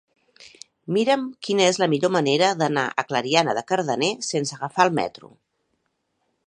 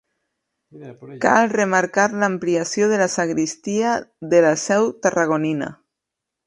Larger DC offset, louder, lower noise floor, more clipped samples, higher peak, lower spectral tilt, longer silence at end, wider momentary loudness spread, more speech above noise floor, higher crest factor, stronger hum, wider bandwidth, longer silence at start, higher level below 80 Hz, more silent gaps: neither; second, -22 LUFS vs -19 LUFS; second, -73 dBFS vs -83 dBFS; neither; about the same, -2 dBFS vs 0 dBFS; about the same, -4 dB/octave vs -4.5 dB/octave; first, 1.4 s vs 0.75 s; about the same, 7 LU vs 8 LU; second, 51 dB vs 64 dB; about the same, 22 dB vs 20 dB; neither; about the same, 10.5 kHz vs 11.5 kHz; second, 0.4 s vs 0.75 s; second, -70 dBFS vs -64 dBFS; neither